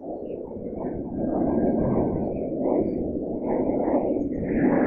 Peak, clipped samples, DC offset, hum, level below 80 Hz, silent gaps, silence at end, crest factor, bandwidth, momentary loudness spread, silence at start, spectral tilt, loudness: -10 dBFS; under 0.1%; under 0.1%; none; -44 dBFS; none; 0 s; 16 dB; 2.9 kHz; 10 LU; 0 s; -13 dB/octave; -26 LUFS